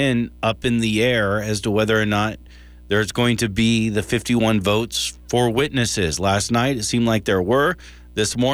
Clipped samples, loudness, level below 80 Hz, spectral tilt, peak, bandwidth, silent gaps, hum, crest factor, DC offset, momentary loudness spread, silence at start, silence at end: under 0.1%; -20 LUFS; -42 dBFS; -4.5 dB/octave; -6 dBFS; over 20 kHz; none; none; 14 dB; under 0.1%; 5 LU; 0 s; 0 s